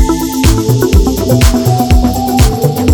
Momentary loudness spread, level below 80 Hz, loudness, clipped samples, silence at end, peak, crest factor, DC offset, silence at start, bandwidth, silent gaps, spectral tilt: 2 LU; -14 dBFS; -10 LUFS; 2%; 0 s; 0 dBFS; 8 dB; under 0.1%; 0 s; 19.5 kHz; none; -6 dB/octave